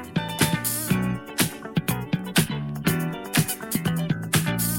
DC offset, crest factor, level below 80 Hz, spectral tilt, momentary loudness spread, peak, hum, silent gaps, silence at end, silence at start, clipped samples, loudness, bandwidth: under 0.1%; 20 dB; -50 dBFS; -4 dB/octave; 5 LU; -6 dBFS; none; none; 0 s; 0 s; under 0.1%; -25 LUFS; 17 kHz